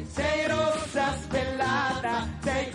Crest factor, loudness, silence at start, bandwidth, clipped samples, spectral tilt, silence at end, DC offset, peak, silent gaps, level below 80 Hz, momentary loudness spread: 14 dB; -27 LUFS; 0 s; 11.5 kHz; under 0.1%; -4.5 dB/octave; 0 s; under 0.1%; -14 dBFS; none; -46 dBFS; 4 LU